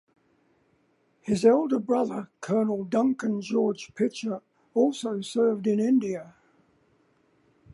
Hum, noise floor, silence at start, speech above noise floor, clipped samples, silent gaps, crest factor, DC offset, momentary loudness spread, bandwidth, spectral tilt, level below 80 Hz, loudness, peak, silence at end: none; -67 dBFS; 1.25 s; 42 dB; under 0.1%; none; 18 dB; under 0.1%; 11 LU; 11.5 kHz; -6.5 dB/octave; -68 dBFS; -26 LUFS; -8 dBFS; 1.45 s